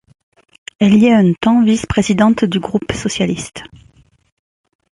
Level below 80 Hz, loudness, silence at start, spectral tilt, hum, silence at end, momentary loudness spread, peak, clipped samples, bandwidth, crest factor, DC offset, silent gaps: -40 dBFS; -14 LUFS; 0.8 s; -6 dB/octave; none; 1.35 s; 10 LU; 0 dBFS; under 0.1%; 11.5 kHz; 14 dB; under 0.1%; none